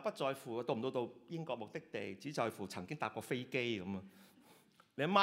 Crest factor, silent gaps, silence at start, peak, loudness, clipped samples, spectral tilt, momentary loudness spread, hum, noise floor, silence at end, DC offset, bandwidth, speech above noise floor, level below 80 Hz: 24 dB; none; 0 s; -16 dBFS; -41 LUFS; under 0.1%; -5.5 dB/octave; 8 LU; none; -67 dBFS; 0 s; under 0.1%; 16 kHz; 25 dB; -84 dBFS